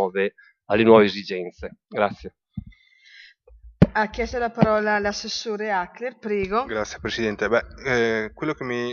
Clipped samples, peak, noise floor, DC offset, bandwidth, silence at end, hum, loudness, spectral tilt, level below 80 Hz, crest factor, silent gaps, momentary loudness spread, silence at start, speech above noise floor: under 0.1%; 0 dBFS; -52 dBFS; under 0.1%; 7.2 kHz; 0 s; none; -23 LUFS; -4.5 dB/octave; -46 dBFS; 24 dB; none; 14 LU; 0 s; 29 dB